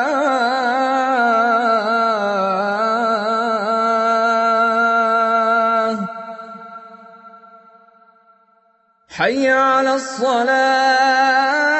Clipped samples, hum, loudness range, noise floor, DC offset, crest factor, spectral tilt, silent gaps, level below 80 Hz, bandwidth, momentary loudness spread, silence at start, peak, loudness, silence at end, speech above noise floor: under 0.1%; none; 9 LU; -59 dBFS; under 0.1%; 14 dB; -3.5 dB/octave; none; -68 dBFS; 8.4 kHz; 10 LU; 0 s; -4 dBFS; -16 LUFS; 0 s; 43 dB